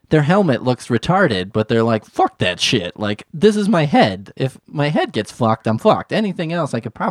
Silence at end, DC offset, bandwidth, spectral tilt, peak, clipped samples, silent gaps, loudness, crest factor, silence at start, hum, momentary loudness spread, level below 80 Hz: 0 s; under 0.1%; 13 kHz; -6 dB/octave; 0 dBFS; under 0.1%; none; -17 LUFS; 16 dB; 0.1 s; none; 9 LU; -50 dBFS